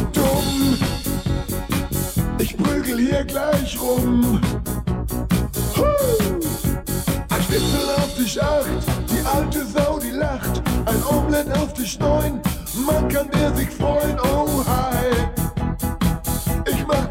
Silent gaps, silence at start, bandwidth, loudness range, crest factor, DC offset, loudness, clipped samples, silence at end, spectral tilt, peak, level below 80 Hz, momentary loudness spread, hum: none; 0 s; 16.5 kHz; 1 LU; 14 dB; under 0.1%; -21 LUFS; under 0.1%; 0 s; -5.5 dB/octave; -6 dBFS; -28 dBFS; 5 LU; none